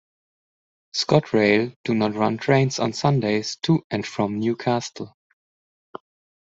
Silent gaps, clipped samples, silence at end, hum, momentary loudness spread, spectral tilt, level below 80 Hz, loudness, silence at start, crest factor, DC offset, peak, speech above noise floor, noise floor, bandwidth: 1.76-1.84 s, 3.84-3.90 s; under 0.1%; 1.4 s; none; 9 LU; -5.5 dB/octave; -60 dBFS; -22 LUFS; 0.95 s; 22 dB; under 0.1%; -2 dBFS; over 69 dB; under -90 dBFS; 8 kHz